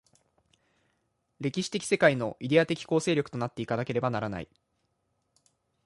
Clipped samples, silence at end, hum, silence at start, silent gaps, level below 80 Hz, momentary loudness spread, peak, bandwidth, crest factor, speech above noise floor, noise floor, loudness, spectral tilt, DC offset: under 0.1%; 1.4 s; none; 1.4 s; none; -64 dBFS; 11 LU; -8 dBFS; 11.5 kHz; 22 dB; 49 dB; -77 dBFS; -28 LUFS; -5.5 dB/octave; under 0.1%